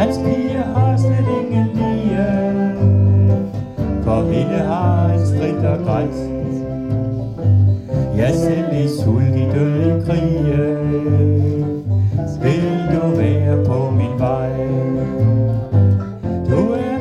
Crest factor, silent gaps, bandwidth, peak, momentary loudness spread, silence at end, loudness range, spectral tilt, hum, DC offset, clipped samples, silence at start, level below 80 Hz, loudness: 14 dB; none; 9.8 kHz; -2 dBFS; 6 LU; 0 s; 2 LU; -9 dB/octave; none; under 0.1%; under 0.1%; 0 s; -36 dBFS; -17 LUFS